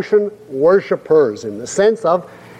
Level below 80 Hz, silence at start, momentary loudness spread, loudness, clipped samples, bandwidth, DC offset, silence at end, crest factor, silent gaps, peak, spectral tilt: -60 dBFS; 0 s; 9 LU; -16 LUFS; under 0.1%; 10 kHz; under 0.1%; 0 s; 12 dB; none; -2 dBFS; -5.5 dB/octave